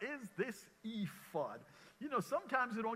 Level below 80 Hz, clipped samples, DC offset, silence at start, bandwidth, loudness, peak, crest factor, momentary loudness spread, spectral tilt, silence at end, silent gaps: -82 dBFS; under 0.1%; under 0.1%; 0 s; 16 kHz; -42 LUFS; -22 dBFS; 20 dB; 13 LU; -5.5 dB/octave; 0 s; none